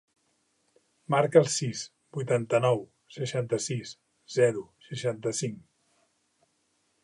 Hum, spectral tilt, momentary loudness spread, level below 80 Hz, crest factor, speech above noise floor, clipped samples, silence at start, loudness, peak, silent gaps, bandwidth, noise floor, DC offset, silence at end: none; -5 dB/octave; 16 LU; -74 dBFS; 24 dB; 46 dB; under 0.1%; 1.1 s; -28 LUFS; -6 dBFS; none; 11.5 kHz; -73 dBFS; under 0.1%; 1.45 s